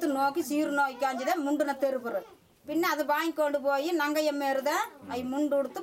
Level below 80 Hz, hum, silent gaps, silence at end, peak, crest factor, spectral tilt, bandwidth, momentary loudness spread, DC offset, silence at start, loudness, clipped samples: -74 dBFS; none; none; 0 s; -14 dBFS; 14 dB; -3 dB/octave; 16 kHz; 6 LU; under 0.1%; 0 s; -29 LUFS; under 0.1%